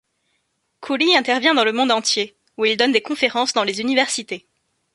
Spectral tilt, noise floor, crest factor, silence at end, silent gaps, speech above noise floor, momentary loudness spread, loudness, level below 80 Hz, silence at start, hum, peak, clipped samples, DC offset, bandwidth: -1.5 dB/octave; -70 dBFS; 20 dB; 0.55 s; none; 51 dB; 11 LU; -18 LUFS; -68 dBFS; 0.8 s; none; -2 dBFS; under 0.1%; under 0.1%; 11.5 kHz